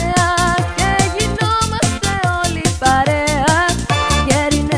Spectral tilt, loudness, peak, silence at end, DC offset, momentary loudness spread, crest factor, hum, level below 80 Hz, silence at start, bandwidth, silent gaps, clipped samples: -4 dB/octave; -15 LUFS; 0 dBFS; 0 s; under 0.1%; 3 LU; 16 dB; none; -26 dBFS; 0 s; 11 kHz; none; under 0.1%